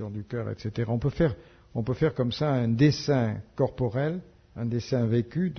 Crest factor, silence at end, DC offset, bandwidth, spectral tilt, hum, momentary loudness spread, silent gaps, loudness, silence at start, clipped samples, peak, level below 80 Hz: 18 dB; 0 s; under 0.1%; 6.6 kHz; -7.5 dB/octave; none; 11 LU; none; -27 LUFS; 0 s; under 0.1%; -10 dBFS; -50 dBFS